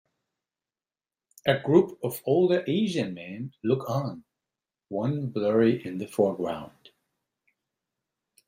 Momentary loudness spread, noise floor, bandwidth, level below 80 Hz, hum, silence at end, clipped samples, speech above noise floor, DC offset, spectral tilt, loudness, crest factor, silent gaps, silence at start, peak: 14 LU; under -90 dBFS; 16 kHz; -68 dBFS; none; 1.8 s; under 0.1%; over 64 dB; under 0.1%; -7 dB/octave; -26 LUFS; 22 dB; none; 1.45 s; -6 dBFS